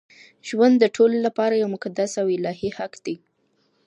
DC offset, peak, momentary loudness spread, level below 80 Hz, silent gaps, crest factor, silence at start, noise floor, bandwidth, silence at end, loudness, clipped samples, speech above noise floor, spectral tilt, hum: under 0.1%; -4 dBFS; 16 LU; -66 dBFS; none; 18 dB; 0.45 s; -67 dBFS; 9.8 kHz; 0.7 s; -21 LUFS; under 0.1%; 46 dB; -5.5 dB/octave; none